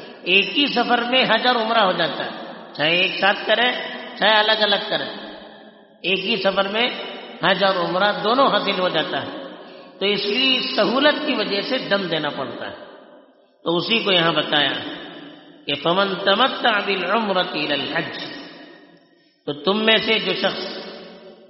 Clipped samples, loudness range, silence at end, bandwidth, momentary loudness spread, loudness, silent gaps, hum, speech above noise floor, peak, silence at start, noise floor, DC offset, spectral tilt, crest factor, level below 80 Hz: under 0.1%; 4 LU; 0.15 s; 6 kHz; 17 LU; -19 LUFS; none; none; 36 dB; -2 dBFS; 0 s; -56 dBFS; under 0.1%; -1 dB/octave; 20 dB; -66 dBFS